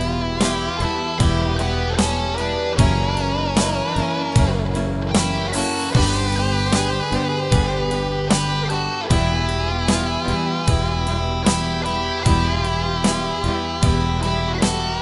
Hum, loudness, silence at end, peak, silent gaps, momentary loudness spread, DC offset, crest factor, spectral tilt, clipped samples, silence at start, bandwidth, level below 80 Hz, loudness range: none; -20 LUFS; 0 s; -4 dBFS; none; 4 LU; under 0.1%; 16 dB; -5 dB/octave; under 0.1%; 0 s; 11.5 kHz; -28 dBFS; 1 LU